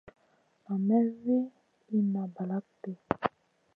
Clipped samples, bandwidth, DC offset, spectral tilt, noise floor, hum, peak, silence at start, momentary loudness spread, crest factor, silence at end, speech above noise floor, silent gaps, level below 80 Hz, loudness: under 0.1%; 4.9 kHz; under 0.1%; -10.5 dB/octave; -69 dBFS; none; -8 dBFS; 0.05 s; 11 LU; 24 dB; 0.5 s; 40 dB; none; -68 dBFS; -31 LUFS